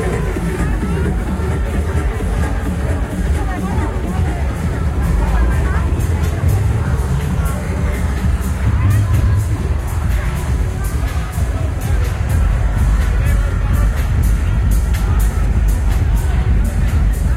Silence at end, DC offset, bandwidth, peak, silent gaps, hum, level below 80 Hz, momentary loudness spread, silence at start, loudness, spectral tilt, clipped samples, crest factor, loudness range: 0 s; under 0.1%; 15 kHz; -2 dBFS; none; none; -18 dBFS; 3 LU; 0 s; -18 LUFS; -7 dB/octave; under 0.1%; 12 dB; 2 LU